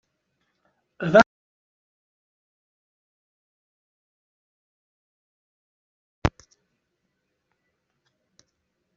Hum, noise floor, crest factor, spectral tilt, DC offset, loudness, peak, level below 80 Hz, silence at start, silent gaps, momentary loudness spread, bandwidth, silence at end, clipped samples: none; -77 dBFS; 28 dB; -4.5 dB/octave; under 0.1%; -22 LUFS; -2 dBFS; -50 dBFS; 1 s; 1.26-6.22 s; 12 LU; 7.4 kHz; 2.65 s; under 0.1%